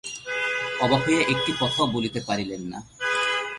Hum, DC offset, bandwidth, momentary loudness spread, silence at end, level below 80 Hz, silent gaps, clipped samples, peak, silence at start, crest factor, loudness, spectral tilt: none; under 0.1%; 11.5 kHz; 9 LU; 0 s; -56 dBFS; none; under 0.1%; -6 dBFS; 0.05 s; 20 dB; -24 LUFS; -4 dB/octave